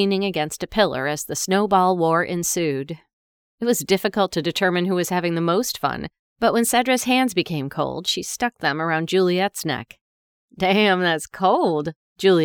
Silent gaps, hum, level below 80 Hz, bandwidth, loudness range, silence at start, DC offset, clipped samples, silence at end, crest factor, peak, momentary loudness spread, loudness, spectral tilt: 3.13-3.58 s, 6.19-6.36 s, 10.01-10.48 s, 11.96-12.16 s; none; -56 dBFS; over 20 kHz; 2 LU; 0 s; under 0.1%; under 0.1%; 0 s; 16 dB; -4 dBFS; 8 LU; -21 LUFS; -4 dB/octave